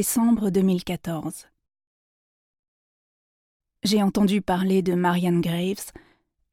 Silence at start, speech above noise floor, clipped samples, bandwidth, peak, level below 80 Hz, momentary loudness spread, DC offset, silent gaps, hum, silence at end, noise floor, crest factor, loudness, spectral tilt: 0 s; over 68 dB; under 0.1%; 17 kHz; -10 dBFS; -54 dBFS; 12 LU; under 0.1%; 1.87-3.60 s; none; 0.6 s; under -90 dBFS; 14 dB; -23 LUFS; -5.5 dB/octave